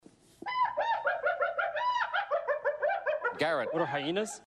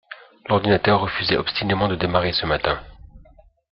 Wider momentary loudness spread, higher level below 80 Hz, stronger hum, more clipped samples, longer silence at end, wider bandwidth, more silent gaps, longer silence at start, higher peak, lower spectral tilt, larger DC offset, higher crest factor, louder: second, 2 LU vs 8 LU; second, -74 dBFS vs -44 dBFS; neither; neither; second, 0.05 s vs 0.55 s; first, 12.5 kHz vs 5.8 kHz; neither; first, 0.4 s vs 0.1 s; second, -16 dBFS vs -2 dBFS; second, -4 dB/octave vs -9 dB/octave; neither; about the same, 16 dB vs 20 dB; second, -31 LUFS vs -21 LUFS